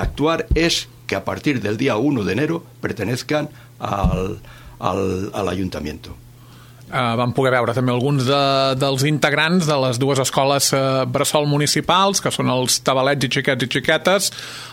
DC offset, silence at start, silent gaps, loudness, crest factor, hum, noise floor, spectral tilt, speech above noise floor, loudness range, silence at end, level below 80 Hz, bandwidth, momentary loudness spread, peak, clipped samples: under 0.1%; 0 s; none; -19 LUFS; 18 dB; none; -43 dBFS; -4.5 dB/octave; 24 dB; 7 LU; 0 s; -36 dBFS; 17 kHz; 10 LU; -2 dBFS; under 0.1%